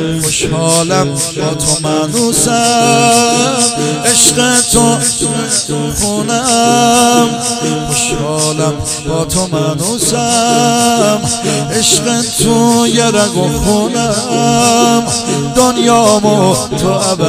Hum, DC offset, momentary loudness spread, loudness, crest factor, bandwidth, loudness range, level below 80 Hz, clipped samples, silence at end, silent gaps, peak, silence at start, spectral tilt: none; under 0.1%; 6 LU; -10 LUFS; 10 dB; 16.5 kHz; 3 LU; -34 dBFS; 0.2%; 0 s; none; 0 dBFS; 0 s; -3.5 dB/octave